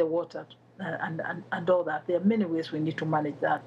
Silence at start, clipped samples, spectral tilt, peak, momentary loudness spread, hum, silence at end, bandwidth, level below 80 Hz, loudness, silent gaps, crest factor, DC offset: 0 s; under 0.1%; -8 dB/octave; -14 dBFS; 12 LU; none; 0 s; 7.6 kHz; -80 dBFS; -29 LUFS; none; 16 dB; under 0.1%